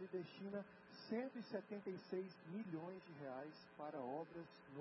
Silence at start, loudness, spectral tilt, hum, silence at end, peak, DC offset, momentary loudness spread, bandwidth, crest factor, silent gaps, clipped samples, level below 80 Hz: 0 s; -51 LUFS; -5.5 dB/octave; none; 0 s; -34 dBFS; under 0.1%; 9 LU; 5.8 kHz; 16 dB; none; under 0.1%; under -90 dBFS